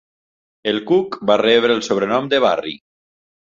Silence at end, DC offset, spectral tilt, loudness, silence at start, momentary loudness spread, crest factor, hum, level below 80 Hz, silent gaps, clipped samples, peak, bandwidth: 0.75 s; under 0.1%; -4.5 dB/octave; -17 LUFS; 0.65 s; 11 LU; 16 dB; none; -60 dBFS; none; under 0.1%; -2 dBFS; 7.6 kHz